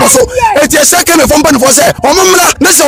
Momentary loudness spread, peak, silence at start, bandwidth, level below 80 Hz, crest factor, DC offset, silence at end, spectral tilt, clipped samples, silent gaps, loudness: 2 LU; 0 dBFS; 0 s; over 20 kHz; -30 dBFS; 6 dB; under 0.1%; 0 s; -2 dB/octave; 2%; none; -5 LUFS